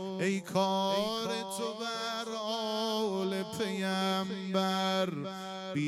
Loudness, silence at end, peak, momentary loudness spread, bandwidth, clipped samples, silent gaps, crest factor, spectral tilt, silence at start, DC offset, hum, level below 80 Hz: -33 LUFS; 0 s; -16 dBFS; 6 LU; 15.5 kHz; under 0.1%; none; 16 dB; -4.5 dB/octave; 0 s; under 0.1%; none; -78 dBFS